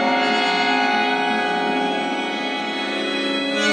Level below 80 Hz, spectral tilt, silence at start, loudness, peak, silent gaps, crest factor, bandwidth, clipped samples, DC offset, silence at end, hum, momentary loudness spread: -68 dBFS; -3 dB/octave; 0 s; -20 LUFS; -6 dBFS; none; 14 dB; 10 kHz; under 0.1%; under 0.1%; 0 s; none; 5 LU